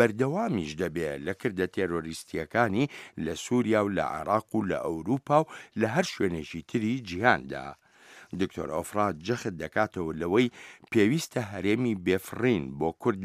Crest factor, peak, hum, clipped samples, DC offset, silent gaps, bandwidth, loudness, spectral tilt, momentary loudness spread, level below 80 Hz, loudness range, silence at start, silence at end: 24 dB; -4 dBFS; none; under 0.1%; under 0.1%; none; 15.5 kHz; -29 LUFS; -6 dB/octave; 9 LU; -58 dBFS; 3 LU; 0 s; 0 s